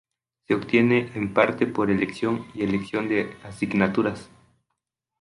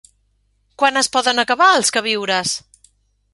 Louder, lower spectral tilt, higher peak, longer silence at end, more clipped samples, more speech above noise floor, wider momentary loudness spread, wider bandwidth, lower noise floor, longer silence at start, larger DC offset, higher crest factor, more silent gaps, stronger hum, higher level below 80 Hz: second, -24 LUFS vs -16 LUFS; first, -7 dB/octave vs -1 dB/octave; second, -4 dBFS vs 0 dBFS; first, 0.95 s vs 0.75 s; neither; first, 58 dB vs 47 dB; about the same, 7 LU vs 7 LU; about the same, 11.5 kHz vs 11.5 kHz; first, -81 dBFS vs -63 dBFS; second, 0.5 s vs 0.8 s; neither; about the same, 22 dB vs 18 dB; neither; neither; about the same, -56 dBFS vs -60 dBFS